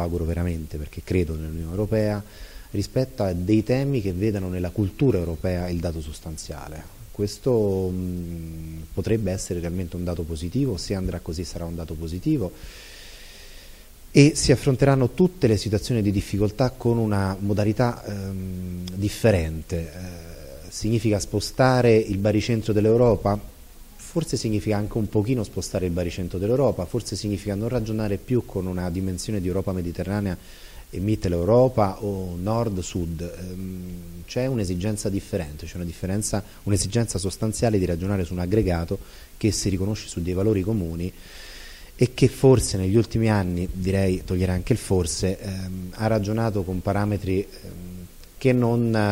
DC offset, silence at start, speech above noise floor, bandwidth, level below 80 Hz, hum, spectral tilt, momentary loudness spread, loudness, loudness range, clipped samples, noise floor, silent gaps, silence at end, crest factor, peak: under 0.1%; 0 s; 21 dB; 16 kHz; -40 dBFS; none; -6.5 dB/octave; 15 LU; -24 LUFS; 6 LU; under 0.1%; -44 dBFS; none; 0 s; 22 dB; -2 dBFS